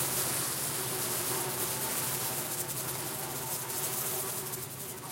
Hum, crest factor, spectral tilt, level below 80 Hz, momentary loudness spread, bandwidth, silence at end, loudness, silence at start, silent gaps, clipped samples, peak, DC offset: none; 20 dB; -2 dB/octave; -66 dBFS; 5 LU; 17 kHz; 0 s; -32 LUFS; 0 s; none; under 0.1%; -14 dBFS; under 0.1%